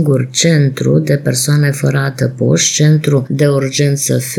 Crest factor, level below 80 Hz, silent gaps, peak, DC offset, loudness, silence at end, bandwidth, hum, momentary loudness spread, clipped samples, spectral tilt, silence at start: 10 dB; -52 dBFS; none; 0 dBFS; under 0.1%; -12 LUFS; 0 s; 16.5 kHz; none; 4 LU; under 0.1%; -5 dB/octave; 0 s